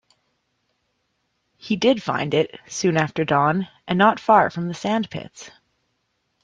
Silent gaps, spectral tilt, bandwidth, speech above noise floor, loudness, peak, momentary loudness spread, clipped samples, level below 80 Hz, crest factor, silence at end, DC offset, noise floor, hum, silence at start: none; -5.5 dB/octave; 9.8 kHz; 52 dB; -21 LUFS; -2 dBFS; 11 LU; under 0.1%; -62 dBFS; 20 dB; 0.95 s; under 0.1%; -72 dBFS; none; 1.65 s